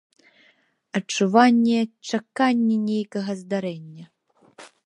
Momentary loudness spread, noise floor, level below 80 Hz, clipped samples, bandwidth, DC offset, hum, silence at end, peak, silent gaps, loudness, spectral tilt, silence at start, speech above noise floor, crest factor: 13 LU; -62 dBFS; -76 dBFS; under 0.1%; 10.5 kHz; under 0.1%; none; 0.2 s; -2 dBFS; none; -22 LUFS; -5 dB/octave; 0.95 s; 40 dB; 20 dB